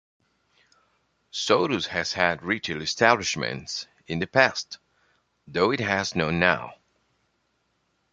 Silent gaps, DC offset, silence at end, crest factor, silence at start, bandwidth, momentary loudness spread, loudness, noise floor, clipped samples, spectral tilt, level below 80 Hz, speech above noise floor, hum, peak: none; under 0.1%; 1.4 s; 26 dB; 1.35 s; 9.6 kHz; 13 LU; -24 LUFS; -72 dBFS; under 0.1%; -3.5 dB/octave; -56 dBFS; 48 dB; none; -2 dBFS